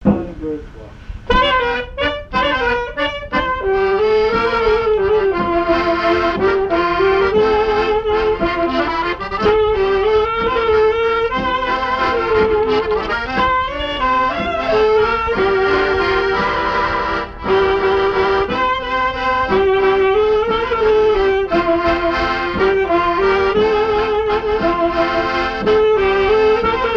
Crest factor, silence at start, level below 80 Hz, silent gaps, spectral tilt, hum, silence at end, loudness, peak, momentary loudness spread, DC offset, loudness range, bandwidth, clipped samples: 14 dB; 0 s; -34 dBFS; none; -6 dB/octave; none; 0 s; -16 LUFS; 0 dBFS; 5 LU; under 0.1%; 2 LU; 7 kHz; under 0.1%